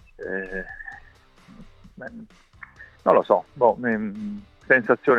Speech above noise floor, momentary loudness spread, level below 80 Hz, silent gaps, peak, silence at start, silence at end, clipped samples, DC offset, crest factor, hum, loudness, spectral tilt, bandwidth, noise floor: 30 dB; 23 LU; -52 dBFS; none; -4 dBFS; 0.2 s; 0 s; under 0.1%; under 0.1%; 22 dB; none; -22 LUFS; -8 dB/octave; 7 kHz; -52 dBFS